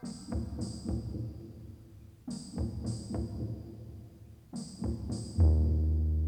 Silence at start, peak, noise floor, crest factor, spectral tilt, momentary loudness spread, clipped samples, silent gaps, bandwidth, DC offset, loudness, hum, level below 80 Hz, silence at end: 0 s; -14 dBFS; -53 dBFS; 18 dB; -7.5 dB/octave; 21 LU; under 0.1%; none; 9.6 kHz; under 0.1%; -34 LUFS; none; -36 dBFS; 0 s